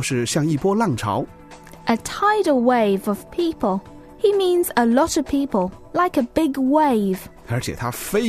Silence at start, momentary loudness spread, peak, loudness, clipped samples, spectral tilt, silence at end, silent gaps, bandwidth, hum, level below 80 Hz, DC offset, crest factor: 0 s; 9 LU; -4 dBFS; -20 LUFS; under 0.1%; -5.5 dB/octave; 0 s; none; 14 kHz; none; -48 dBFS; under 0.1%; 16 dB